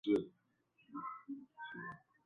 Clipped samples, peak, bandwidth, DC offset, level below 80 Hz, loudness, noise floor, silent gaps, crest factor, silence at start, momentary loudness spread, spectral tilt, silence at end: under 0.1%; -22 dBFS; 6.6 kHz; under 0.1%; -80 dBFS; -45 LUFS; -77 dBFS; none; 22 dB; 0.05 s; 15 LU; -4.5 dB/octave; 0.25 s